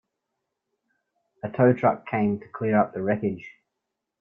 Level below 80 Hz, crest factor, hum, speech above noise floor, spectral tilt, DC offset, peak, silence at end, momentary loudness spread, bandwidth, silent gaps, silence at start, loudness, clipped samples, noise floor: -64 dBFS; 20 dB; none; 59 dB; -10.5 dB/octave; under 0.1%; -6 dBFS; 0.7 s; 14 LU; 3.8 kHz; none; 1.45 s; -24 LUFS; under 0.1%; -83 dBFS